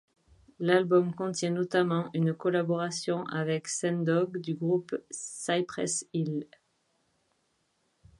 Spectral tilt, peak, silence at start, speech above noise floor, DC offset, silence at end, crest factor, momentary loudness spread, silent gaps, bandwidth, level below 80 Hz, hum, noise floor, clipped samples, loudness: -5 dB/octave; -10 dBFS; 0.6 s; 45 dB; under 0.1%; 1.75 s; 20 dB; 8 LU; none; 11.5 kHz; -72 dBFS; none; -74 dBFS; under 0.1%; -30 LUFS